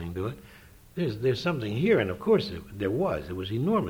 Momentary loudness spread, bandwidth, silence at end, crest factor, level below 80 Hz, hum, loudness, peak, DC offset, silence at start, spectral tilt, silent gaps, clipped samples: 11 LU; over 20 kHz; 0 s; 18 dB; -52 dBFS; none; -28 LUFS; -10 dBFS; under 0.1%; 0 s; -7.5 dB/octave; none; under 0.1%